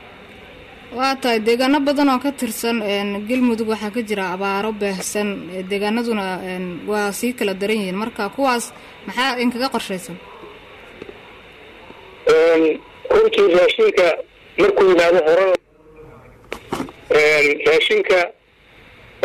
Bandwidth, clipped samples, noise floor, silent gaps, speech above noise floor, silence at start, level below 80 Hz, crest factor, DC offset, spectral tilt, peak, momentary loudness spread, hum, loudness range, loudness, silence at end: 14.5 kHz; under 0.1%; -49 dBFS; none; 31 dB; 0 s; -52 dBFS; 12 dB; under 0.1%; -4 dB/octave; -8 dBFS; 15 LU; none; 7 LU; -18 LUFS; 0.95 s